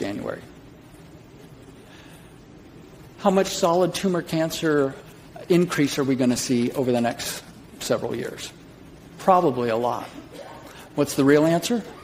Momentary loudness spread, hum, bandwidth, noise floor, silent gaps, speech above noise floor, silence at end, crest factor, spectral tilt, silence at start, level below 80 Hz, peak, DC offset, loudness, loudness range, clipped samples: 20 LU; none; 16 kHz; -46 dBFS; none; 24 dB; 0 s; 22 dB; -5 dB/octave; 0 s; -56 dBFS; -2 dBFS; under 0.1%; -23 LUFS; 4 LU; under 0.1%